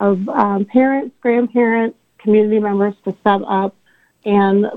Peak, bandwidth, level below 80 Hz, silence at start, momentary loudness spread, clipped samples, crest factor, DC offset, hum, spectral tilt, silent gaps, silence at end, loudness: 0 dBFS; 4.2 kHz; -62 dBFS; 0 s; 6 LU; under 0.1%; 16 dB; under 0.1%; none; -9.5 dB/octave; none; 0 s; -16 LUFS